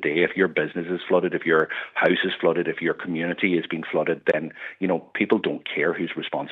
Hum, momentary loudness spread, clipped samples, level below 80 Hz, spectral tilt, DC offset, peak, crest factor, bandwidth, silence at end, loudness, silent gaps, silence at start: none; 6 LU; under 0.1%; -72 dBFS; -8 dB/octave; under 0.1%; -6 dBFS; 18 dB; 4.9 kHz; 0 s; -24 LUFS; none; 0 s